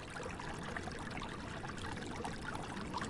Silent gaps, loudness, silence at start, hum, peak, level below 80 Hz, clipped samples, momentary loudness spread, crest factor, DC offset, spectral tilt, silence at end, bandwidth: none; -44 LUFS; 0 s; none; -26 dBFS; -54 dBFS; under 0.1%; 2 LU; 18 dB; under 0.1%; -4.5 dB/octave; 0 s; 11.5 kHz